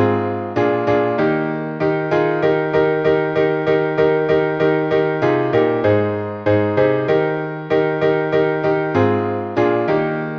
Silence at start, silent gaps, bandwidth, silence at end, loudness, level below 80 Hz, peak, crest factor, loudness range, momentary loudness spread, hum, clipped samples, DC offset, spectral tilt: 0 s; none; 6.6 kHz; 0 s; -17 LUFS; -52 dBFS; -2 dBFS; 14 dB; 1 LU; 4 LU; none; under 0.1%; under 0.1%; -8.5 dB/octave